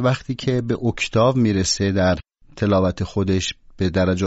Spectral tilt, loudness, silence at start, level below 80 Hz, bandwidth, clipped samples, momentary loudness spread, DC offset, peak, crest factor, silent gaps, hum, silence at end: -5.5 dB/octave; -20 LUFS; 0 s; -42 dBFS; 8 kHz; under 0.1%; 7 LU; under 0.1%; -6 dBFS; 14 dB; none; none; 0 s